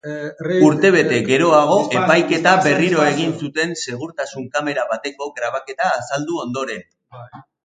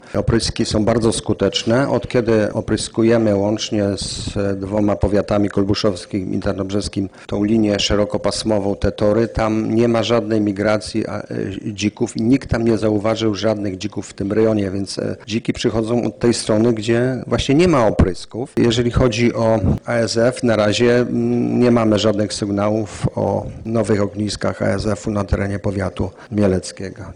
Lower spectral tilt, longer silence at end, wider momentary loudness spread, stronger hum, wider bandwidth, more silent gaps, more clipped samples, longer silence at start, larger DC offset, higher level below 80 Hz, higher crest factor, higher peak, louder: about the same, -5 dB/octave vs -6 dB/octave; first, 0.25 s vs 0 s; first, 13 LU vs 8 LU; neither; second, 9.4 kHz vs 10.5 kHz; neither; neither; about the same, 0.05 s vs 0.05 s; neither; second, -62 dBFS vs -36 dBFS; first, 18 dB vs 12 dB; first, 0 dBFS vs -6 dBFS; about the same, -17 LUFS vs -18 LUFS